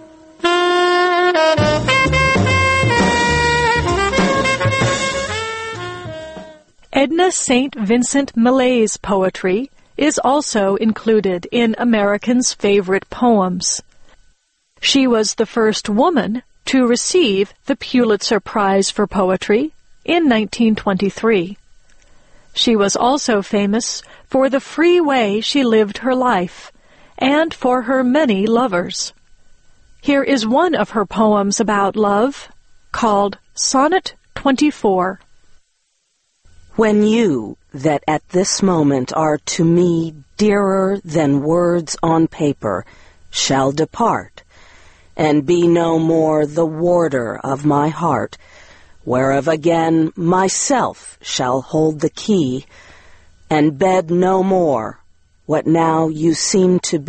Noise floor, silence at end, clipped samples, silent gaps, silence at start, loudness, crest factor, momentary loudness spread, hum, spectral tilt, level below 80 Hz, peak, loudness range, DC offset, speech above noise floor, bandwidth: -66 dBFS; 0 s; under 0.1%; none; 0 s; -16 LUFS; 16 dB; 8 LU; none; -4.5 dB/octave; -42 dBFS; 0 dBFS; 3 LU; under 0.1%; 50 dB; 8.8 kHz